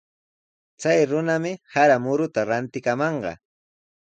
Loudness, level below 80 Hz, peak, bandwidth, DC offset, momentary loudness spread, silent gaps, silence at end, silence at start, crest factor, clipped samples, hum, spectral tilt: -22 LUFS; -64 dBFS; -6 dBFS; 9 kHz; under 0.1%; 9 LU; none; 0.85 s; 0.8 s; 18 dB; under 0.1%; none; -6 dB/octave